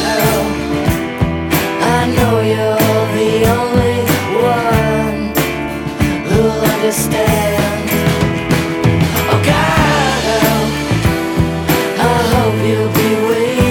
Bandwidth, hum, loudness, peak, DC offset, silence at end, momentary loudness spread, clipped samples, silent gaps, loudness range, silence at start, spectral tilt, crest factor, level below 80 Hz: over 20 kHz; none; -14 LUFS; 0 dBFS; under 0.1%; 0 s; 4 LU; under 0.1%; none; 1 LU; 0 s; -5.5 dB/octave; 12 dB; -30 dBFS